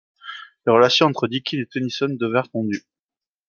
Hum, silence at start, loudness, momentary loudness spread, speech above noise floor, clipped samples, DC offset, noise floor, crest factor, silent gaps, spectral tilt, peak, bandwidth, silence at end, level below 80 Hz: none; 0.25 s; -20 LUFS; 17 LU; over 70 dB; under 0.1%; under 0.1%; under -90 dBFS; 20 dB; none; -5 dB/octave; -2 dBFS; 7.2 kHz; 0.7 s; -68 dBFS